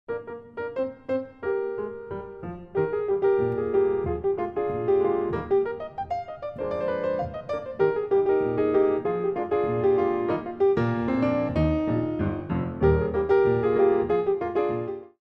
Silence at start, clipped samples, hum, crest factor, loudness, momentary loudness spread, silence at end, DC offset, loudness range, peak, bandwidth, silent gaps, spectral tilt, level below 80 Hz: 0.1 s; under 0.1%; none; 16 dB; -25 LUFS; 11 LU; 0.15 s; under 0.1%; 4 LU; -8 dBFS; 5.4 kHz; none; -10 dB/octave; -44 dBFS